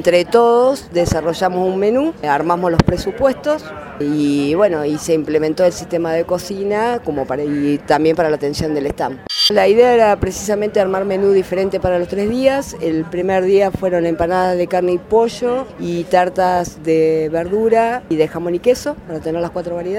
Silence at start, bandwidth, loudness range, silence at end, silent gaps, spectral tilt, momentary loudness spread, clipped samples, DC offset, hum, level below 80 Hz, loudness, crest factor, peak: 0 s; 16.5 kHz; 3 LU; 0 s; none; -5.5 dB/octave; 8 LU; under 0.1%; under 0.1%; none; -40 dBFS; -16 LUFS; 16 dB; 0 dBFS